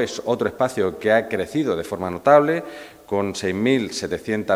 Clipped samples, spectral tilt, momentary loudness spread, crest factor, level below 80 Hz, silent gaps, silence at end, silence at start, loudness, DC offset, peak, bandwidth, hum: under 0.1%; -5 dB/octave; 11 LU; 20 dB; -58 dBFS; none; 0 s; 0 s; -21 LUFS; under 0.1%; 0 dBFS; 16 kHz; none